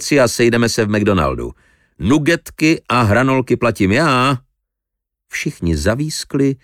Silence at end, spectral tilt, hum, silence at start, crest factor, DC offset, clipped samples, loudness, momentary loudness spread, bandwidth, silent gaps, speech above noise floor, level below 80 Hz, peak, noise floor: 0.1 s; -5.5 dB/octave; none; 0 s; 14 dB; under 0.1%; under 0.1%; -16 LUFS; 10 LU; 17 kHz; none; 65 dB; -36 dBFS; -2 dBFS; -80 dBFS